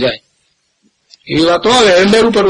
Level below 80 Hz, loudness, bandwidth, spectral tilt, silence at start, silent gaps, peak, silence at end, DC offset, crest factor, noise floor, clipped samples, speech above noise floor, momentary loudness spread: -42 dBFS; -10 LUFS; 11.5 kHz; -4 dB/octave; 0 s; none; 0 dBFS; 0 s; under 0.1%; 12 dB; -60 dBFS; under 0.1%; 52 dB; 11 LU